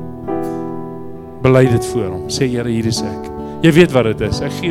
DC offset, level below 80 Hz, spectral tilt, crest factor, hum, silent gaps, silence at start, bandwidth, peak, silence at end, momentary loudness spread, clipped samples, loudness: under 0.1%; -40 dBFS; -6 dB/octave; 16 dB; none; none; 0 s; 16 kHz; 0 dBFS; 0 s; 16 LU; 0.3%; -16 LUFS